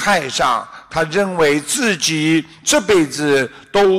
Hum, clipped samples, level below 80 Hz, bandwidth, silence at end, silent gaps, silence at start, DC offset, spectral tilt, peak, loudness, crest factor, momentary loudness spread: none; under 0.1%; -48 dBFS; 15.5 kHz; 0 s; none; 0 s; under 0.1%; -3.5 dB/octave; -4 dBFS; -16 LUFS; 12 dB; 5 LU